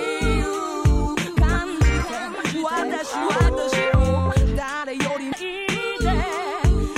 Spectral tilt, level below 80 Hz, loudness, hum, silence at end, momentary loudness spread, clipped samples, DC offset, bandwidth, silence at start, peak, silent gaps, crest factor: -5.5 dB/octave; -24 dBFS; -22 LUFS; none; 0 s; 6 LU; under 0.1%; under 0.1%; 13.5 kHz; 0 s; -6 dBFS; none; 16 dB